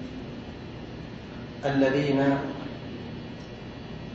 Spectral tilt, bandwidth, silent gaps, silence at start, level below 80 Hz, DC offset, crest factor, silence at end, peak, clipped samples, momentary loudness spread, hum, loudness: -7.5 dB/octave; 7.6 kHz; none; 0 s; -52 dBFS; under 0.1%; 18 dB; 0 s; -10 dBFS; under 0.1%; 16 LU; none; -30 LUFS